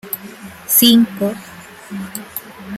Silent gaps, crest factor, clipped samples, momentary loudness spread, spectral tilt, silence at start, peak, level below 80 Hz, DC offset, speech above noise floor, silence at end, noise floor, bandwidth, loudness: none; 18 dB; under 0.1%; 24 LU; -3 dB/octave; 0.05 s; 0 dBFS; -58 dBFS; under 0.1%; 21 dB; 0 s; -35 dBFS; 16.5 kHz; -13 LUFS